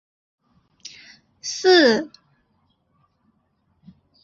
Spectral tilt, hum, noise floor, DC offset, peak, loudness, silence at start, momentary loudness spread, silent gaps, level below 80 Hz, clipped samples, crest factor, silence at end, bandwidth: -2.5 dB/octave; none; -67 dBFS; under 0.1%; -2 dBFS; -18 LUFS; 1.45 s; 27 LU; none; -70 dBFS; under 0.1%; 22 dB; 2.15 s; 7.8 kHz